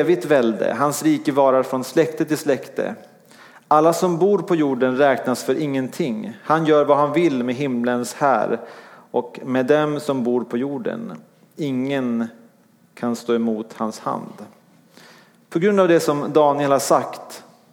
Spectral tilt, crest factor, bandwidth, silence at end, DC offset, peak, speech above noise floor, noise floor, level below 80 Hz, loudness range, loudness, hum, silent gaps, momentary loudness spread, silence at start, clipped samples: -5.5 dB/octave; 18 dB; 18 kHz; 0.3 s; under 0.1%; -2 dBFS; 36 dB; -55 dBFS; -74 dBFS; 6 LU; -20 LUFS; none; none; 12 LU; 0 s; under 0.1%